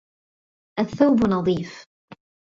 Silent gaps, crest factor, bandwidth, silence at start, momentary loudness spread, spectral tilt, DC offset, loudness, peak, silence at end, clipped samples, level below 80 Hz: 1.86-2.08 s; 18 dB; 7.6 kHz; 0.75 s; 15 LU; -7.5 dB/octave; under 0.1%; -21 LUFS; -4 dBFS; 0.35 s; under 0.1%; -52 dBFS